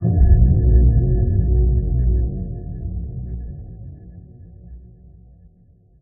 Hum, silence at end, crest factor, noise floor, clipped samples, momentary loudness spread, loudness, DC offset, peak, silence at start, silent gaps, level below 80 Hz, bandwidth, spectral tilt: none; 1.2 s; 16 dB; -52 dBFS; under 0.1%; 21 LU; -19 LUFS; under 0.1%; -2 dBFS; 0 s; none; -20 dBFS; 1.8 kHz; -13 dB/octave